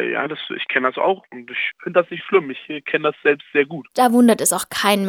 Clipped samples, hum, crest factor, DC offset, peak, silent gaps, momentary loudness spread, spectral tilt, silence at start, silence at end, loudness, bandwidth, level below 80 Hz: under 0.1%; none; 20 dB; under 0.1%; 0 dBFS; none; 12 LU; -3.5 dB/octave; 0 s; 0 s; -19 LUFS; 19.5 kHz; -66 dBFS